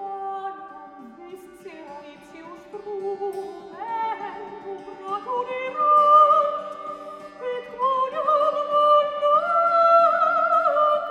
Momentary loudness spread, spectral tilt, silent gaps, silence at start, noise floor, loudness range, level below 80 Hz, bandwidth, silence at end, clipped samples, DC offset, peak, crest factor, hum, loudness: 25 LU; -4 dB/octave; none; 0 s; -42 dBFS; 16 LU; -70 dBFS; 9.4 kHz; 0 s; under 0.1%; under 0.1%; -6 dBFS; 16 dB; none; -20 LUFS